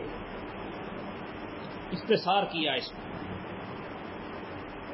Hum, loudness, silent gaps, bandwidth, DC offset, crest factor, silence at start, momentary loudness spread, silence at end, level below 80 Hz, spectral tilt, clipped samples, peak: none; -34 LUFS; none; 5.8 kHz; under 0.1%; 22 dB; 0 s; 13 LU; 0 s; -56 dBFS; -8.5 dB/octave; under 0.1%; -14 dBFS